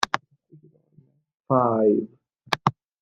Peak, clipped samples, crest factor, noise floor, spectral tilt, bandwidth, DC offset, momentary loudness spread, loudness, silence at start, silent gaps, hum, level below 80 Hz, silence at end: -2 dBFS; under 0.1%; 24 dB; -59 dBFS; -5.5 dB/octave; 15 kHz; under 0.1%; 10 LU; -23 LUFS; 0 s; 1.34-1.38 s; none; -68 dBFS; 0.3 s